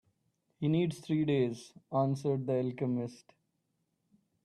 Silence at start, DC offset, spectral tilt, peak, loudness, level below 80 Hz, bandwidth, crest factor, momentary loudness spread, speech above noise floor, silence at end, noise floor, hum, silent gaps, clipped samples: 0.6 s; under 0.1%; -8 dB/octave; -18 dBFS; -33 LUFS; -74 dBFS; 12 kHz; 16 dB; 6 LU; 48 dB; 1.3 s; -80 dBFS; none; none; under 0.1%